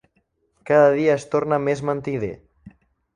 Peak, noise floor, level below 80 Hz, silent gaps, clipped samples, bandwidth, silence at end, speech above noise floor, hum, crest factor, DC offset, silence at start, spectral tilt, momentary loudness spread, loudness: -4 dBFS; -68 dBFS; -56 dBFS; none; under 0.1%; 10.5 kHz; 0.45 s; 48 dB; none; 18 dB; under 0.1%; 0.65 s; -7 dB/octave; 12 LU; -20 LUFS